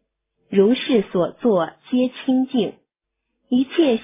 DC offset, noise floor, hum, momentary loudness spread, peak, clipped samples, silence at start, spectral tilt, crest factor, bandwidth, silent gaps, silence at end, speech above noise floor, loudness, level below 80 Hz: under 0.1%; -79 dBFS; none; 6 LU; -4 dBFS; under 0.1%; 0.5 s; -10.5 dB/octave; 16 dB; 3.8 kHz; none; 0 s; 60 dB; -20 LUFS; -62 dBFS